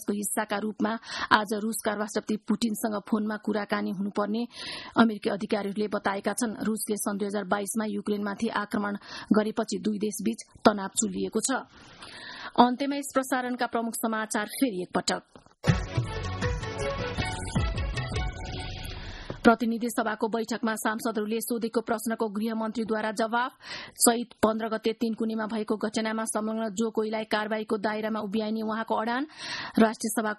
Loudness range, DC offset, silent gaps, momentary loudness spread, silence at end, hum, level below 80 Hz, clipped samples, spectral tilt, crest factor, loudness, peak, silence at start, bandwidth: 2 LU; under 0.1%; none; 8 LU; 0 s; none; -46 dBFS; under 0.1%; -4.5 dB/octave; 26 dB; -28 LUFS; -2 dBFS; 0 s; 12.5 kHz